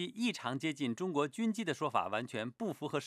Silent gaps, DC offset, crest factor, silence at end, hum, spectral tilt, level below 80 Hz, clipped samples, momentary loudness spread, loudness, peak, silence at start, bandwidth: none; under 0.1%; 18 dB; 0 s; none; -5 dB/octave; -86 dBFS; under 0.1%; 5 LU; -36 LUFS; -18 dBFS; 0 s; 14.5 kHz